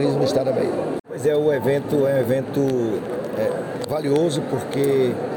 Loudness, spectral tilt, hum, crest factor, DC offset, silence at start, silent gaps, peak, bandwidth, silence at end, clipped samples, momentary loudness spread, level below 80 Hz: -21 LUFS; -6.5 dB/octave; none; 12 dB; under 0.1%; 0 s; 1.00-1.04 s; -8 dBFS; 17.5 kHz; 0 s; under 0.1%; 7 LU; -60 dBFS